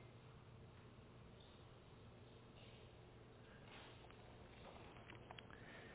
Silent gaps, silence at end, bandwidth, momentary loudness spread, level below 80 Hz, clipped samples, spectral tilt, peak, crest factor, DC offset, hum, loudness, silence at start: none; 0 s; 4 kHz; 5 LU; -72 dBFS; under 0.1%; -4.5 dB/octave; -38 dBFS; 24 dB; under 0.1%; none; -62 LUFS; 0 s